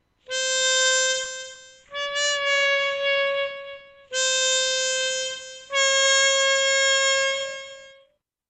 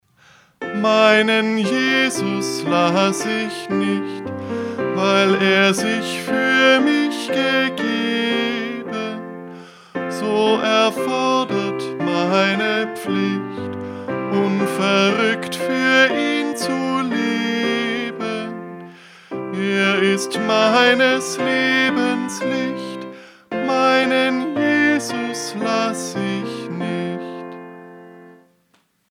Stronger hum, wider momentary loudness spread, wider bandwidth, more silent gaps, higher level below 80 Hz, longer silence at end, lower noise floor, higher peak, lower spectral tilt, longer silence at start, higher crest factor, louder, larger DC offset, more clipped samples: first, 60 Hz at -65 dBFS vs none; about the same, 16 LU vs 14 LU; second, 9.4 kHz vs 16 kHz; neither; about the same, -68 dBFS vs -66 dBFS; second, 0.6 s vs 0.8 s; about the same, -63 dBFS vs -62 dBFS; second, -8 dBFS vs 0 dBFS; second, 3.5 dB/octave vs -4 dB/octave; second, 0.3 s vs 0.6 s; about the same, 16 dB vs 18 dB; second, -21 LUFS vs -18 LUFS; neither; neither